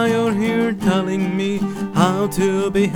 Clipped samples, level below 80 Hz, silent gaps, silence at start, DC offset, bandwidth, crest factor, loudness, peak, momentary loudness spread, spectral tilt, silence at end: under 0.1%; -46 dBFS; none; 0 s; under 0.1%; 18.5 kHz; 18 dB; -19 LUFS; 0 dBFS; 4 LU; -6 dB/octave; 0 s